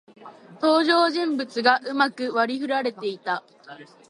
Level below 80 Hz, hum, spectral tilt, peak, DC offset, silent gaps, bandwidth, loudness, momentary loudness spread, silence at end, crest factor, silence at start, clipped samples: -80 dBFS; none; -4 dB/octave; -4 dBFS; under 0.1%; none; 11.5 kHz; -23 LUFS; 10 LU; 0.25 s; 20 dB; 0.2 s; under 0.1%